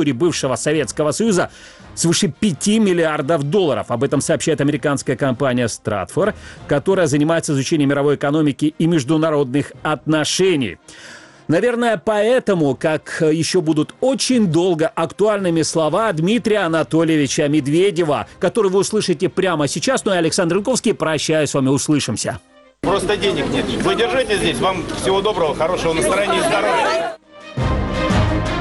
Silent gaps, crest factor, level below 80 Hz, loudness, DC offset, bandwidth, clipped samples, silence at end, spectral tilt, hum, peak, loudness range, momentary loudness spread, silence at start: none; 12 dB; -38 dBFS; -17 LUFS; under 0.1%; 12 kHz; under 0.1%; 0 s; -5 dB/octave; none; -4 dBFS; 2 LU; 5 LU; 0 s